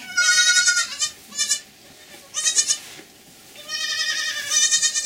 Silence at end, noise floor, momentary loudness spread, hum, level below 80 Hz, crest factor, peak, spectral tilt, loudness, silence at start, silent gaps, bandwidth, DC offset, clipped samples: 0 s; -47 dBFS; 12 LU; none; -68 dBFS; 20 dB; -2 dBFS; 3.5 dB/octave; -19 LUFS; 0 s; none; 16 kHz; under 0.1%; under 0.1%